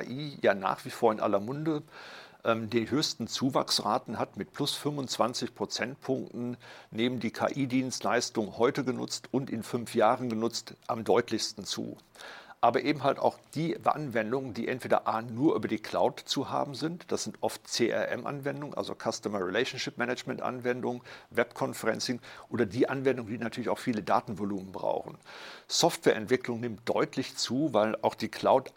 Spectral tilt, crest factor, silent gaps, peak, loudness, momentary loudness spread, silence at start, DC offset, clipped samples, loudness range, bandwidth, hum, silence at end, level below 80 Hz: -4.5 dB/octave; 22 dB; none; -10 dBFS; -31 LUFS; 9 LU; 0 s; under 0.1%; under 0.1%; 3 LU; 16.5 kHz; none; 0.05 s; -72 dBFS